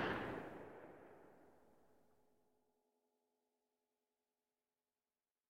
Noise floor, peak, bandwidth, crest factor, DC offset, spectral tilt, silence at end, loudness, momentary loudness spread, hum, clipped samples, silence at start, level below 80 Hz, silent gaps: under -90 dBFS; -30 dBFS; 16 kHz; 24 dB; under 0.1%; -6 dB/octave; 3.75 s; -49 LUFS; 22 LU; none; under 0.1%; 0 s; -76 dBFS; none